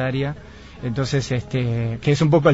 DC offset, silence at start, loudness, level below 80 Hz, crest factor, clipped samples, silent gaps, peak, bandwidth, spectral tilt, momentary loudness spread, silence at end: 0.3%; 0 s; -22 LUFS; -44 dBFS; 18 dB; under 0.1%; none; -2 dBFS; 8 kHz; -7 dB/octave; 14 LU; 0 s